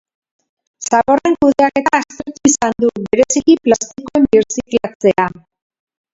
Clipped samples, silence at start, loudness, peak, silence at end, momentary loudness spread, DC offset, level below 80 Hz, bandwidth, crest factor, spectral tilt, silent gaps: under 0.1%; 0.8 s; -14 LUFS; 0 dBFS; 0.85 s; 6 LU; under 0.1%; -48 dBFS; 7.8 kHz; 14 dB; -4 dB/octave; 4.95-5.00 s